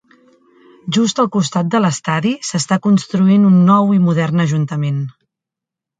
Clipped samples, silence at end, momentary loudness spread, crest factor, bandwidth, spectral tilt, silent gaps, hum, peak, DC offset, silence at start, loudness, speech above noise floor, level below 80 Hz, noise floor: under 0.1%; 0.9 s; 9 LU; 14 dB; 9.4 kHz; -6 dB/octave; none; none; 0 dBFS; under 0.1%; 0.85 s; -15 LUFS; 71 dB; -60 dBFS; -84 dBFS